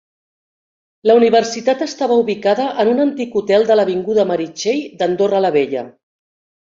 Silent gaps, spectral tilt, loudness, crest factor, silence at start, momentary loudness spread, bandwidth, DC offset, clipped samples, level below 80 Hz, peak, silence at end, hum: none; -5 dB/octave; -16 LUFS; 14 dB; 1.05 s; 7 LU; 7.6 kHz; under 0.1%; under 0.1%; -62 dBFS; -2 dBFS; 0.85 s; none